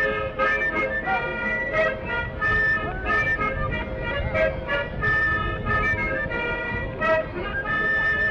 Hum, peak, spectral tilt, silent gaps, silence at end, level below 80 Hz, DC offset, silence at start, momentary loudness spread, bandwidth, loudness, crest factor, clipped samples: none; -12 dBFS; -6.5 dB/octave; none; 0 s; -36 dBFS; under 0.1%; 0 s; 7 LU; 7.8 kHz; -23 LUFS; 12 dB; under 0.1%